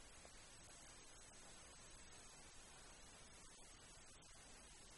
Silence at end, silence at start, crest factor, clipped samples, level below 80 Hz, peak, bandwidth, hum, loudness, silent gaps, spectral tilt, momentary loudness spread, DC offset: 0 s; 0 s; 14 dB; under 0.1%; -70 dBFS; -48 dBFS; 11.5 kHz; none; -61 LUFS; none; -1.5 dB/octave; 1 LU; under 0.1%